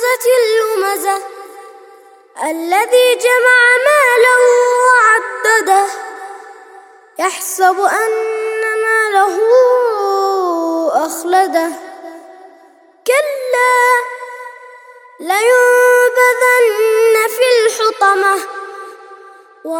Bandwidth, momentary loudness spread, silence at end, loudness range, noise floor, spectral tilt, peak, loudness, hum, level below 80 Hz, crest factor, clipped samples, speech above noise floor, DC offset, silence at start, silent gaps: 19 kHz; 19 LU; 0 s; 7 LU; -45 dBFS; 0.5 dB/octave; 0 dBFS; -12 LUFS; none; -74 dBFS; 14 dB; under 0.1%; 34 dB; under 0.1%; 0 s; none